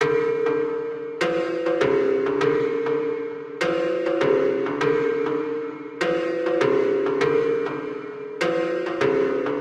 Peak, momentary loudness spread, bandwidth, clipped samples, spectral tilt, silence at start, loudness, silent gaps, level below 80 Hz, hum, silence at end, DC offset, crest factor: -8 dBFS; 8 LU; 9.4 kHz; under 0.1%; -6 dB/octave; 0 s; -23 LUFS; none; -62 dBFS; none; 0 s; under 0.1%; 14 dB